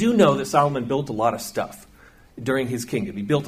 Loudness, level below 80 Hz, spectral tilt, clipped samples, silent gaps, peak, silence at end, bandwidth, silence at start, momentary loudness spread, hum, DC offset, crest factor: -23 LUFS; -54 dBFS; -6 dB/octave; under 0.1%; none; -4 dBFS; 0 s; 15.5 kHz; 0 s; 12 LU; none; under 0.1%; 18 dB